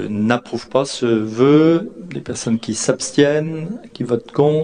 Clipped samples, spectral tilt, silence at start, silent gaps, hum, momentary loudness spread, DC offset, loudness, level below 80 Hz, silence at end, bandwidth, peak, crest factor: under 0.1%; -5.5 dB/octave; 0 s; none; none; 14 LU; under 0.1%; -18 LUFS; -56 dBFS; 0 s; 10 kHz; 0 dBFS; 18 dB